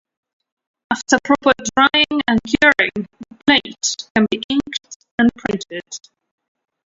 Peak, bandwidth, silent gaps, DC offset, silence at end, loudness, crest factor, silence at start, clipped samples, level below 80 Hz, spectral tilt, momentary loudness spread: 0 dBFS; 7.8 kHz; 4.10-4.15 s, 4.44-4.49 s, 4.96-5.00 s, 5.11-5.18 s; under 0.1%; 0.9 s; -16 LUFS; 18 dB; 0.9 s; under 0.1%; -50 dBFS; -3 dB/octave; 16 LU